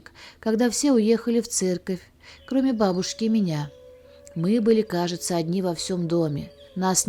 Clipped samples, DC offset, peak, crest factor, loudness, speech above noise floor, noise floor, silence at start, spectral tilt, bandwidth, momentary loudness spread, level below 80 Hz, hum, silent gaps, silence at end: under 0.1%; under 0.1%; -8 dBFS; 16 dB; -24 LUFS; 25 dB; -48 dBFS; 0.2 s; -5 dB/octave; 18.5 kHz; 11 LU; -58 dBFS; none; none; 0 s